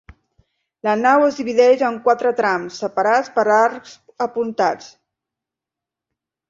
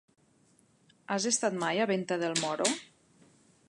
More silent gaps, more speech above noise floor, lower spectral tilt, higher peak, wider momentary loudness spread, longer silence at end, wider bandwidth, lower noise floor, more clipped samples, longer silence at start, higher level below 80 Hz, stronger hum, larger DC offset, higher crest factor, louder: neither; first, 69 dB vs 36 dB; first, -4.5 dB/octave vs -3 dB/octave; first, -2 dBFS vs -12 dBFS; first, 10 LU vs 4 LU; first, 1.65 s vs 0.85 s; second, 7.6 kHz vs 11.5 kHz; first, -86 dBFS vs -66 dBFS; neither; second, 0.85 s vs 1.1 s; first, -60 dBFS vs -82 dBFS; neither; neither; about the same, 18 dB vs 22 dB; first, -18 LUFS vs -30 LUFS